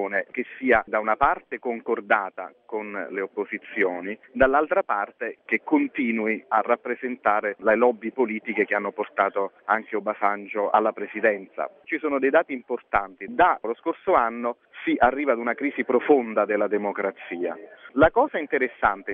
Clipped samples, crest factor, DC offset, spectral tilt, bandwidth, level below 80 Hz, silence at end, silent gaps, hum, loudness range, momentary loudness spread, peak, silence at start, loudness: under 0.1%; 20 dB; under 0.1%; -8 dB/octave; 4.5 kHz; -52 dBFS; 0 s; none; none; 2 LU; 11 LU; -4 dBFS; 0 s; -24 LUFS